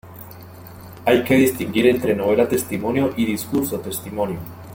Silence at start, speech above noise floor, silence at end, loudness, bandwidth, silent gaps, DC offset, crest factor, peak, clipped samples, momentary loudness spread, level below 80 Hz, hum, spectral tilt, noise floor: 0.05 s; 20 dB; 0 s; -20 LUFS; 17 kHz; none; under 0.1%; 18 dB; -2 dBFS; under 0.1%; 22 LU; -52 dBFS; none; -5.5 dB/octave; -39 dBFS